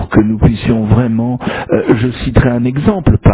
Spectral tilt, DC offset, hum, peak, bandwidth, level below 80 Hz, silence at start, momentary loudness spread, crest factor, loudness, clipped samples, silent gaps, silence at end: -12.5 dB/octave; under 0.1%; none; 0 dBFS; 4 kHz; -22 dBFS; 0 s; 4 LU; 12 dB; -12 LUFS; under 0.1%; none; 0 s